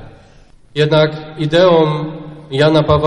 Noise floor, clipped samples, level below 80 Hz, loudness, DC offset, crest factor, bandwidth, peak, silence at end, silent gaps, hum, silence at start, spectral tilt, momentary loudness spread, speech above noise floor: -43 dBFS; under 0.1%; -40 dBFS; -13 LUFS; under 0.1%; 14 dB; 9.8 kHz; 0 dBFS; 0 s; none; none; 0 s; -7 dB/octave; 14 LU; 31 dB